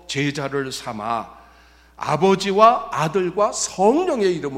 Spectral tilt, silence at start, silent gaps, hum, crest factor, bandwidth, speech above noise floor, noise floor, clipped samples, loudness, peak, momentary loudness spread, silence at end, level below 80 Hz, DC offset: -4.5 dB/octave; 0.1 s; none; none; 18 dB; 15 kHz; 31 dB; -50 dBFS; under 0.1%; -20 LUFS; -2 dBFS; 13 LU; 0 s; -54 dBFS; under 0.1%